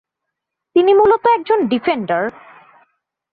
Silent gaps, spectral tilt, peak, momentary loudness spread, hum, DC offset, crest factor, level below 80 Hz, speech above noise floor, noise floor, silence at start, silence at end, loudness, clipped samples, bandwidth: none; -8.5 dB/octave; -2 dBFS; 9 LU; none; under 0.1%; 14 dB; -56 dBFS; 65 dB; -79 dBFS; 0.75 s; 1 s; -15 LUFS; under 0.1%; 4.8 kHz